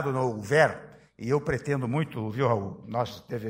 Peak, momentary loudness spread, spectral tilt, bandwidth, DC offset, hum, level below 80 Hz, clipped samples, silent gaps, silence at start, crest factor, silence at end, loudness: -6 dBFS; 10 LU; -6.5 dB/octave; 16 kHz; under 0.1%; none; -58 dBFS; under 0.1%; none; 0 s; 22 dB; 0 s; -28 LUFS